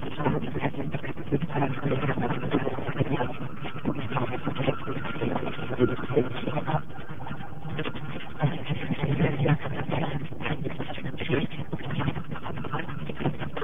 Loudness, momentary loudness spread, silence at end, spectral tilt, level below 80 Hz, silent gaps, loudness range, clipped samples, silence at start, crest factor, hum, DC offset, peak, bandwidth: -30 LUFS; 9 LU; 0 s; -9 dB/octave; -48 dBFS; none; 2 LU; under 0.1%; 0 s; 20 dB; none; 3%; -8 dBFS; 3.9 kHz